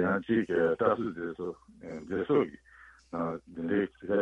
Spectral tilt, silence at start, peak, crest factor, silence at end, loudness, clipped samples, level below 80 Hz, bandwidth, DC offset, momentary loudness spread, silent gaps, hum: -8.5 dB/octave; 0 s; -12 dBFS; 18 dB; 0 s; -31 LUFS; under 0.1%; -62 dBFS; 8.2 kHz; under 0.1%; 14 LU; none; none